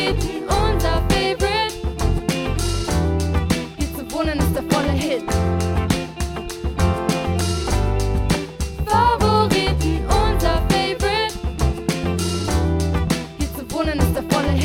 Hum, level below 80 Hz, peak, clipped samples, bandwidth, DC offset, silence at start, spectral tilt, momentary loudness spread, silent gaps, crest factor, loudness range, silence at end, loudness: none; -26 dBFS; -2 dBFS; under 0.1%; 17 kHz; under 0.1%; 0 s; -5.5 dB/octave; 6 LU; none; 16 dB; 3 LU; 0 s; -21 LUFS